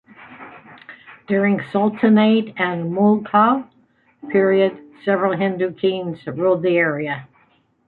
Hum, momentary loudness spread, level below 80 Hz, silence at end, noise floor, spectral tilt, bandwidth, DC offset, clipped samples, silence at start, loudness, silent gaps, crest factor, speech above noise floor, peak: none; 12 LU; -64 dBFS; 0.6 s; -59 dBFS; -9.5 dB/octave; 4.3 kHz; under 0.1%; under 0.1%; 0.2 s; -18 LUFS; none; 18 dB; 41 dB; -2 dBFS